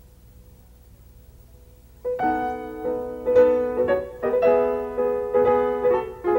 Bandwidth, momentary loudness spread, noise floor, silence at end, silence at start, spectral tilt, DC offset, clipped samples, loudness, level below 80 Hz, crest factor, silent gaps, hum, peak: 16 kHz; 10 LU; -49 dBFS; 0 s; 0.4 s; -7.5 dB/octave; under 0.1%; under 0.1%; -22 LUFS; -48 dBFS; 16 dB; none; 60 Hz at -50 dBFS; -6 dBFS